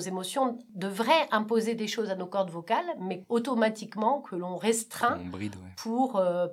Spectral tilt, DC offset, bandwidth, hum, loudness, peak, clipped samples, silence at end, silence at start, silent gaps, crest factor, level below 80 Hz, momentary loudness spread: -4 dB/octave; under 0.1%; 16 kHz; none; -29 LUFS; -10 dBFS; under 0.1%; 0 s; 0 s; none; 20 dB; -74 dBFS; 11 LU